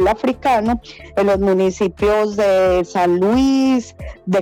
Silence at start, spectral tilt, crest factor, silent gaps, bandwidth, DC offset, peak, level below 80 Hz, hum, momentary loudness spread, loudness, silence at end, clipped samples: 0 s; -6 dB/octave; 10 dB; none; 17.5 kHz; under 0.1%; -6 dBFS; -38 dBFS; none; 7 LU; -16 LUFS; 0 s; under 0.1%